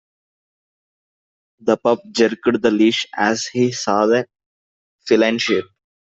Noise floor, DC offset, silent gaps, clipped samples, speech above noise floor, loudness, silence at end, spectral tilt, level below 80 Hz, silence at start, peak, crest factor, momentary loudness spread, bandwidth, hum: under -90 dBFS; under 0.1%; 4.46-4.99 s; under 0.1%; over 73 dB; -18 LUFS; 0.45 s; -4 dB/octave; -62 dBFS; 1.65 s; -2 dBFS; 18 dB; 6 LU; 8 kHz; none